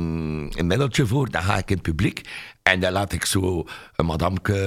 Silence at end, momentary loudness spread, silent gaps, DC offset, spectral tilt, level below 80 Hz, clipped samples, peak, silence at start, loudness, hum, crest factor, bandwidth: 0 s; 8 LU; none; under 0.1%; -5 dB/octave; -38 dBFS; under 0.1%; 0 dBFS; 0 s; -23 LUFS; none; 22 dB; 16 kHz